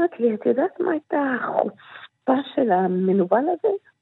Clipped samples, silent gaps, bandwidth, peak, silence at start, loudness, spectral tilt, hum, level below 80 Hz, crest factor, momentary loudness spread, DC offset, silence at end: under 0.1%; none; 4.1 kHz; -4 dBFS; 0 s; -22 LUFS; -10.5 dB/octave; none; -80 dBFS; 18 dB; 7 LU; under 0.1%; 0.25 s